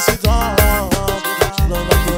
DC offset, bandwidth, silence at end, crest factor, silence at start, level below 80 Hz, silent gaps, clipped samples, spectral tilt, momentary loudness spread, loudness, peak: under 0.1%; 16.5 kHz; 0 s; 14 dB; 0 s; -20 dBFS; none; under 0.1%; -4.5 dB/octave; 4 LU; -16 LUFS; 0 dBFS